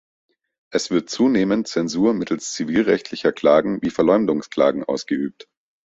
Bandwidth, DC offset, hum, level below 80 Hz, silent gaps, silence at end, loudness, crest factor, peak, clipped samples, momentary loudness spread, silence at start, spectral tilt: 8.2 kHz; under 0.1%; none; -58 dBFS; none; 0.55 s; -20 LUFS; 18 dB; -2 dBFS; under 0.1%; 8 LU; 0.7 s; -5 dB/octave